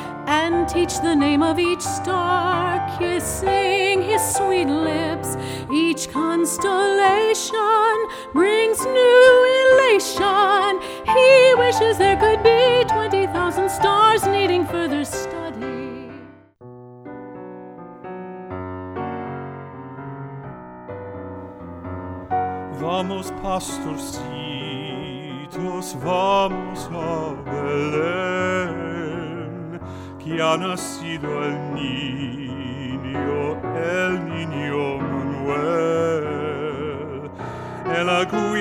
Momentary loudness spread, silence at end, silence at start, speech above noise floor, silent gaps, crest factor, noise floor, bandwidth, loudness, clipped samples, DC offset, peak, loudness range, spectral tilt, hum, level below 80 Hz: 19 LU; 0 s; 0 s; 25 dB; none; 18 dB; -43 dBFS; 17.5 kHz; -20 LUFS; under 0.1%; under 0.1%; -2 dBFS; 17 LU; -4 dB/octave; none; -48 dBFS